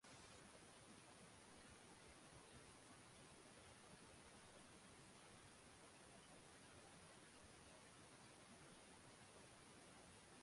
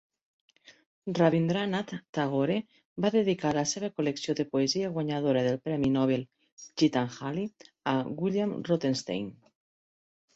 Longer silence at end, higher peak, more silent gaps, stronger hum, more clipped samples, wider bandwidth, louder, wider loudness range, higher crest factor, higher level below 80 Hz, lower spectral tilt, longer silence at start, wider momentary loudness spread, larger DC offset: second, 0 s vs 1.05 s; second, -50 dBFS vs -10 dBFS; second, none vs 2.09-2.13 s, 2.85-2.96 s, 6.52-6.57 s; neither; neither; first, 11.5 kHz vs 8.2 kHz; second, -64 LUFS vs -29 LUFS; about the same, 0 LU vs 2 LU; second, 14 dB vs 20 dB; second, -80 dBFS vs -66 dBFS; second, -3 dB/octave vs -5.5 dB/octave; second, 0 s vs 1.05 s; second, 1 LU vs 10 LU; neither